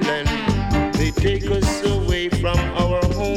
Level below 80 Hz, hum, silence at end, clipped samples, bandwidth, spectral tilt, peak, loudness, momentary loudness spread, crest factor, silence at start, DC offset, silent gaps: -26 dBFS; none; 0 s; under 0.1%; 16 kHz; -5.5 dB/octave; -6 dBFS; -20 LUFS; 1 LU; 14 dB; 0 s; under 0.1%; none